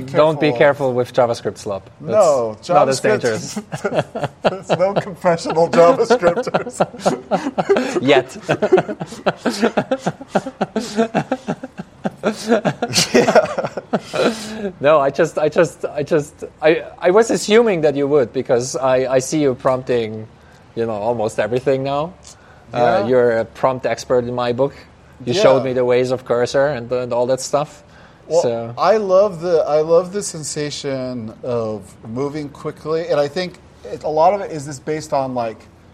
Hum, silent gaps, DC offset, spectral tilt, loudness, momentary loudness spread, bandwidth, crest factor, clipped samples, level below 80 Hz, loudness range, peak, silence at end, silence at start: none; none; under 0.1%; -5 dB/octave; -18 LUFS; 12 LU; 14.5 kHz; 18 dB; under 0.1%; -54 dBFS; 5 LU; 0 dBFS; 0.35 s; 0 s